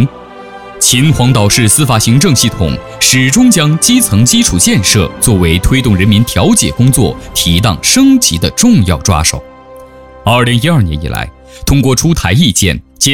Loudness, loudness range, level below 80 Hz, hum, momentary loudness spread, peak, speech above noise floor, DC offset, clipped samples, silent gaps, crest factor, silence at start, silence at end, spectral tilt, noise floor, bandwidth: -9 LUFS; 4 LU; -24 dBFS; none; 8 LU; 0 dBFS; 24 dB; under 0.1%; 0.5%; none; 10 dB; 0 s; 0 s; -4 dB/octave; -33 dBFS; over 20 kHz